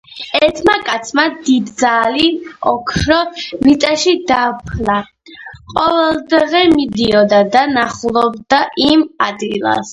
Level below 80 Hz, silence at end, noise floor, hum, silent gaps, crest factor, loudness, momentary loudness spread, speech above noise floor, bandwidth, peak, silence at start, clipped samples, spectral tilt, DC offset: -38 dBFS; 0 s; -35 dBFS; none; none; 14 dB; -13 LUFS; 7 LU; 22 dB; 11.5 kHz; 0 dBFS; 0.1 s; under 0.1%; -4 dB/octave; under 0.1%